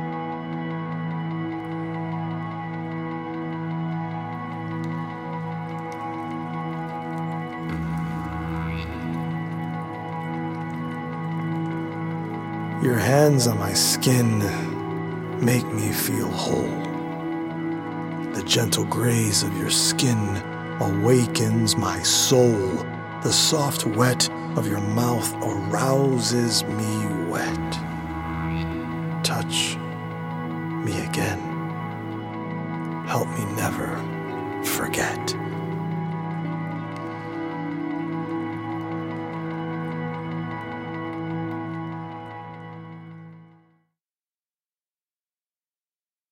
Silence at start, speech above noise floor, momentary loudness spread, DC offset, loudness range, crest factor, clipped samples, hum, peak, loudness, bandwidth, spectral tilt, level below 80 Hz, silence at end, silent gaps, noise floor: 0 s; over 69 dB; 12 LU; under 0.1%; 10 LU; 22 dB; under 0.1%; none; -4 dBFS; -25 LUFS; 17 kHz; -4.5 dB/octave; -52 dBFS; 2.85 s; none; under -90 dBFS